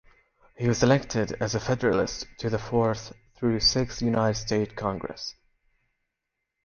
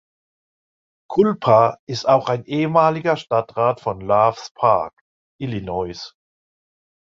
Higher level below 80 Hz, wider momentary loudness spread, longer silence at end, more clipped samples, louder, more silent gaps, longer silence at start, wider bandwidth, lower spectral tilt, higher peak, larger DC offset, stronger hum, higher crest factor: first, -48 dBFS vs -54 dBFS; about the same, 12 LU vs 13 LU; first, 1.35 s vs 0.95 s; neither; second, -26 LUFS vs -19 LUFS; second, none vs 1.79-1.87 s, 4.51-4.55 s, 5.01-5.39 s; second, 0.6 s vs 1.1 s; about the same, 7.2 kHz vs 7.4 kHz; second, -5 dB/octave vs -6.5 dB/octave; second, -8 dBFS vs -2 dBFS; neither; neither; about the same, 20 dB vs 18 dB